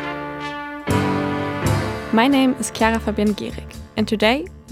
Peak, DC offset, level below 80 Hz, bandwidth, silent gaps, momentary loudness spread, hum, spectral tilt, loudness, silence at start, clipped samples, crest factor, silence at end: -2 dBFS; under 0.1%; -40 dBFS; 16 kHz; none; 12 LU; none; -5 dB/octave; -20 LUFS; 0 s; under 0.1%; 18 dB; 0 s